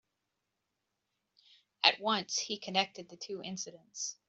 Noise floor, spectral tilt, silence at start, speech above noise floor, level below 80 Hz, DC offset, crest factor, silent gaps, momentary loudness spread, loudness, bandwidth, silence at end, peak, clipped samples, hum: -85 dBFS; -1.5 dB/octave; 1.85 s; 50 dB; -84 dBFS; under 0.1%; 30 dB; none; 15 LU; -33 LUFS; 8.2 kHz; 0.15 s; -8 dBFS; under 0.1%; none